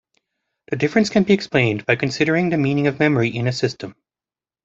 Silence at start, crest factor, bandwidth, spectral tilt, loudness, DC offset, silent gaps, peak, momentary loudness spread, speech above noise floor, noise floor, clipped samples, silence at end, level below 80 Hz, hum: 0.7 s; 18 dB; 8 kHz; -6 dB/octave; -19 LUFS; under 0.1%; none; -2 dBFS; 7 LU; over 71 dB; under -90 dBFS; under 0.1%; 0.75 s; -56 dBFS; none